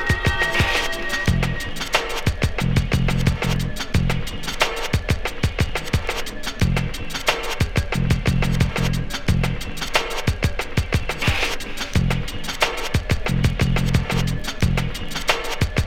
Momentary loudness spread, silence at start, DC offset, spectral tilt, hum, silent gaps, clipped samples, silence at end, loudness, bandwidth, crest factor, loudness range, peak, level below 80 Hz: 5 LU; 0 s; under 0.1%; -5 dB/octave; none; none; under 0.1%; 0 s; -22 LUFS; 17 kHz; 18 dB; 2 LU; -4 dBFS; -28 dBFS